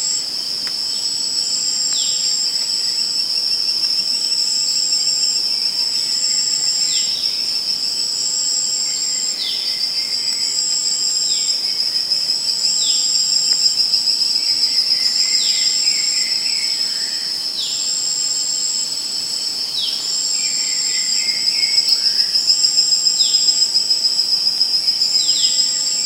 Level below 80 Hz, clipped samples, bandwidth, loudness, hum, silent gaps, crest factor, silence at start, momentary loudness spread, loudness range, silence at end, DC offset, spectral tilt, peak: -72 dBFS; under 0.1%; 16 kHz; -15 LUFS; none; none; 16 dB; 0 s; 5 LU; 4 LU; 0 s; under 0.1%; 2.5 dB/octave; -2 dBFS